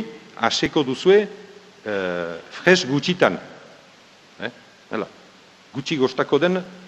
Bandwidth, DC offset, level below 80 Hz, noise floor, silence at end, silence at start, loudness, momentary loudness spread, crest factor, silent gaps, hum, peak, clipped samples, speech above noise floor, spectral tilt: 8.6 kHz; under 0.1%; -60 dBFS; -50 dBFS; 0 s; 0 s; -21 LUFS; 17 LU; 22 dB; none; none; 0 dBFS; under 0.1%; 29 dB; -4.5 dB/octave